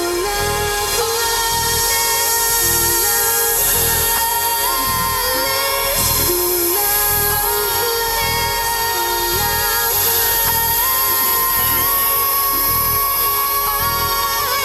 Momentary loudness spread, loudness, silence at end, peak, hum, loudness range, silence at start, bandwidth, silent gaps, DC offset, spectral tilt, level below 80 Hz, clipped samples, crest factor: 4 LU; -14 LUFS; 0 s; -4 dBFS; none; 2 LU; 0 s; 16.5 kHz; none; under 0.1%; -1 dB/octave; -36 dBFS; under 0.1%; 12 dB